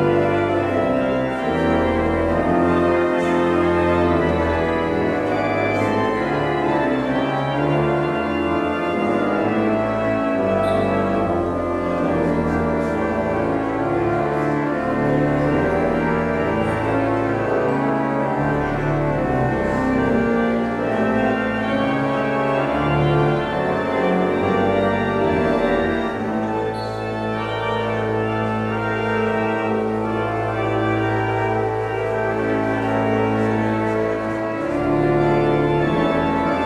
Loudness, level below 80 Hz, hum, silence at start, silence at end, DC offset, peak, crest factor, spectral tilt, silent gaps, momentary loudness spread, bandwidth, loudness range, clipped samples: -20 LUFS; -40 dBFS; none; 0 s; 0 s; under 0.1%; -6 dBFS; 14 dB; -7.5 dB/octave; none; 4 LU; 11.5 kHz; 3 LU; under 0.1%